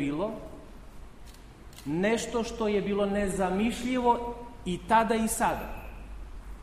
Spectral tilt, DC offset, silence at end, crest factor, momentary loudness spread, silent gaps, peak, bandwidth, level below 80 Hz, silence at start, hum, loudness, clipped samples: -5 dB/octave; under 0.1%; 0 s; 20 dB; 20 LU; none; -10 dBFS; 15.5 kHz; -46 dBFS; 0 s; none; -28 LUFS; under 0.1%